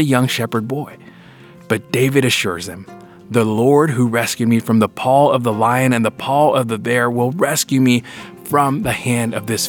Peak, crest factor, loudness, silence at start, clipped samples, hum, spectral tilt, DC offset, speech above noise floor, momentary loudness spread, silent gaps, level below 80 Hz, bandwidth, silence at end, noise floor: 0 dBFS; 16 dB; -16 LUFS; 0 s; under 0.1%; none; -5 dB/octave; under 0.1%; 25 dB; 9 LU; none; -54 dBFS; 19 kHz; 0 s; -41 dBFS